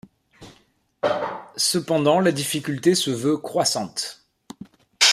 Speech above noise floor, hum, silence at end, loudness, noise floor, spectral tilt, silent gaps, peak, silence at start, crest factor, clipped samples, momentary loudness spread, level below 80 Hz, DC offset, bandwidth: 39 dB; none; 0 s; -22 LUFS; -61 dBFS; -3 dB/octave; none; -2 dBFS; 0.4 s; 22 dB; under 0.1%; 13 LU; -64 dBFS; under 0.1%; 15.5 kHz